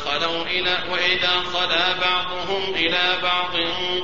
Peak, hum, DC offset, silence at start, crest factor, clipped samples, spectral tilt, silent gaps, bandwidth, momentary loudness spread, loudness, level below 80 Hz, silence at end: -4 dBFS; none; 2%; 0 s; 18 dB; under 0.1%; 0.5 dB/octave; none; 7.6 kHz; 4 LU; -20 LUFS; -50 dBFS; 0 s